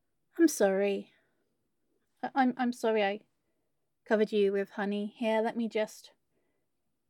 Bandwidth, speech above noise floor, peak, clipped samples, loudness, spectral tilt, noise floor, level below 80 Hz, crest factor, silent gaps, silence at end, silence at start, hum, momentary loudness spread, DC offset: 17.5 kHz; 54 dB; -14 dBFS; under 0.1%; -30 LUFS; -5 dB/octave; -84 dBFS; -84 dBFS; 18 dB; none; 1.1 s; 0.35 s; none; 10 LU; under 0.1%